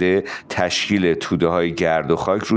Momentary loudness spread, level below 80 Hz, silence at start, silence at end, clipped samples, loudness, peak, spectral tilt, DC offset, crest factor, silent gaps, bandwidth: 3 LU; -48 dBFS; 0 s; 0 s; under 0.1%; -19 LUFS; -4 dBFS; -5 dB/octave; under 0.1%; 16 dB; none; 9.8 kHz